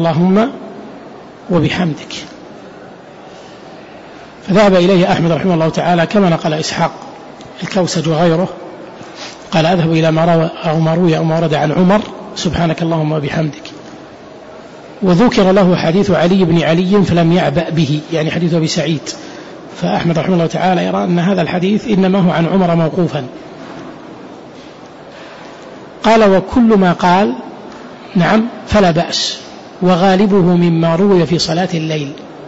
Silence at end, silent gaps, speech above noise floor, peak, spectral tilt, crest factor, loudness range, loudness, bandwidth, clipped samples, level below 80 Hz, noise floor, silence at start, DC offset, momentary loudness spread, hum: 0 s; none; 22 dB; -2 dBFS; -6.5 dB/octave; 10 dB; 6 LU; -13 LUFS; 8 kHz; under 0.1%; -42 dBFS; -34 dBFS; 0 s; under 0.1%; 23 LU; none